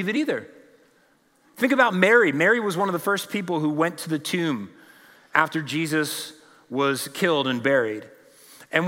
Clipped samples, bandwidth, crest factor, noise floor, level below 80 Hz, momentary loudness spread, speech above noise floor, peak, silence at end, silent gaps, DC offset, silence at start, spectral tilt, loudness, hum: under 0.1%; 16.5 kHz; 22 dB; -61 dBFS; -80 dBFS; 13 LU; 39 dB; -2 dBFS; 0 s; none; under 0.1%; 0 s; -4.5 dB/octave; -23 LUFS; none